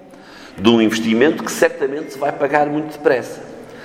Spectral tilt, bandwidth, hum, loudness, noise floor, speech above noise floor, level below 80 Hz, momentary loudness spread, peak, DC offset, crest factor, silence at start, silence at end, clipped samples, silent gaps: -4.5 dB/octave; 16.5 kHz; none; -17 LUFS; -39 dBFS; 23 dB; -56 dBFS; 15 LU; 0 dBFS; under 0.1%; 18 dB; 0.05 s; 0 s; under 0.1%; none